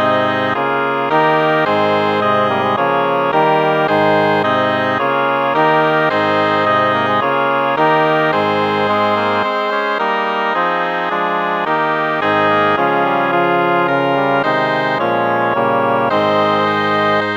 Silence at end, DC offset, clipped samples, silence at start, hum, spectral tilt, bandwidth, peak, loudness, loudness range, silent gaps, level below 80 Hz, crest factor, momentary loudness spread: 0 s; under 0.1%; under 0.1%; 0 s; none; -6.5 dB/octave; 19.5 kHz; 0 dBFS; -14 LUFS; 2 LU; none; -66 dBFS; 14 dB; 3 LU